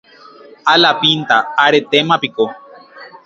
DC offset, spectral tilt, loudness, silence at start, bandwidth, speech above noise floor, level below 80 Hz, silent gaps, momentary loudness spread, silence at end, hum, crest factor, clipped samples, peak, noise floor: under 0.1%; -4 dB/octave; -13 LUFS; 0.65 s; 7.6 kHz; 27 dB; -62 dBFS; none; 9 LU; 0.15 s; none; 16 dB; under 0.1%; 0 dBFS; -40 dBFS